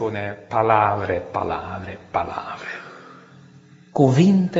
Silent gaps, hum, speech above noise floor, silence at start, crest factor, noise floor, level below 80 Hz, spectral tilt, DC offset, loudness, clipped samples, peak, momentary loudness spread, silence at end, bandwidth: none; none; 28 dB; 0 s; 20 dB; -48 dBFS; -54 dBFS; -6.5 dB/octave; under 0.1%; -21 LUFS; under 0.1%; -2 dBFS; 17 LU; 0 s; 7.8 kHz